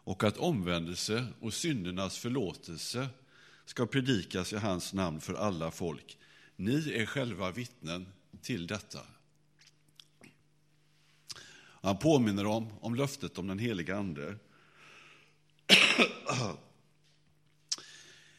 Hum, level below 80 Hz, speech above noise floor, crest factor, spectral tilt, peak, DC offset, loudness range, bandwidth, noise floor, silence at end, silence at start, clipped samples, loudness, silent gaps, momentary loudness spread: 50 Hz at -65 dBFS; -64 dBFS; 38 dB; 30 dB; -4 dB/octave; -6 dBFS; under 0.1%; 14 LU; 15.5 kHz; -70 dBFS; 0.25 s; 0.05 s; under 0.1%; -32 LUFS; none; 19 LU